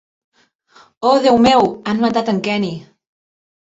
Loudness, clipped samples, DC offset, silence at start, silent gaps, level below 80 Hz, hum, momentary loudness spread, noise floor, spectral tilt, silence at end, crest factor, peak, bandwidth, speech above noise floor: -15 LUFS; under 0.1%; under 0.1%; 1 s; none; -52 dBFS; none; 10 LU; -51 dBFS; -5.5 dB/octave; 0.95 s; 16 dB; -2 dBFS; 8 kHz; 37 dB